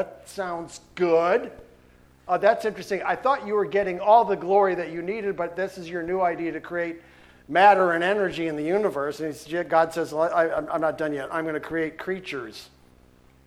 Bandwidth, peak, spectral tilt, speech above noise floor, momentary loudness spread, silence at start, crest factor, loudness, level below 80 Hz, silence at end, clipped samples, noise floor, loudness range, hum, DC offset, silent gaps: 15 kHz; -4 dBFS; -5.5 dB/octave; 31 dB; 14 LU; 0 s; 20 dB; -24 LUFS; -60 dBFS; 0.8 s; under 0.1%; -55 dBFS; 4 LU; none; under 0.1%; none